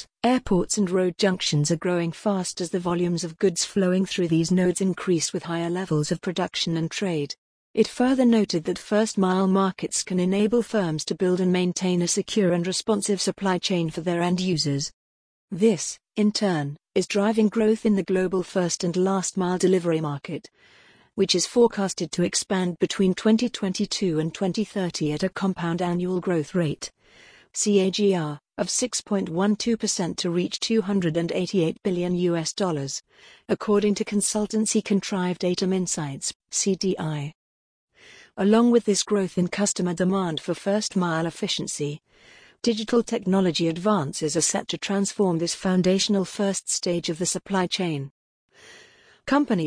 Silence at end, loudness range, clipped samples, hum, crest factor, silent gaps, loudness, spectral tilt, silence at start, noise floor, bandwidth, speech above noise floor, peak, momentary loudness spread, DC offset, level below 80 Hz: 0 s; 3 LU; under 0.1%; none; 18 dB; 7.38-7.74 s, 14.93-15.48 s, 36.35-36.40 s, 37.35-37.88 s, 48.11-48.49 s; -24 LUFS; -4.5 dB/octave; 0 s; -54 dBFS; 10.5 kHz; 30 dB; -6 dBFS; 7 LU; under 0.1%; -58 dBFS